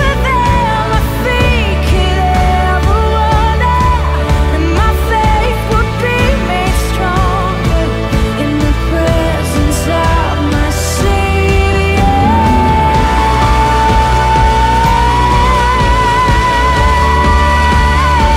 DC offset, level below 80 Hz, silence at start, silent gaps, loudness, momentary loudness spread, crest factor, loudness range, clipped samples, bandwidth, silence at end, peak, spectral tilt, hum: under 0.1%; -14 dBFS; 0 s; none; -11 LUFS; 4 LU; 10 dB; 3 LU; under 0.1%; 16 kHz; 0 s; 0 dBFS; -5.5 dB/octave; none